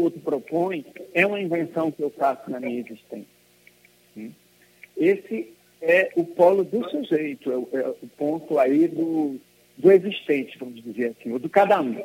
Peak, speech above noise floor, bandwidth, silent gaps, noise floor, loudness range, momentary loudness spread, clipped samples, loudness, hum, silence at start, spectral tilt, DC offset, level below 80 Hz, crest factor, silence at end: -4 dBFS; 34 dB; 16.5 kHz; none; -57 dBFS; 7 LU; 19 LU; under 0.1%; -23 LUFS; 60 Hz at -60 dBFS; 0 s; -7 dB/octave; under 0.1%; -76 dBFS; 20 dB; 0 s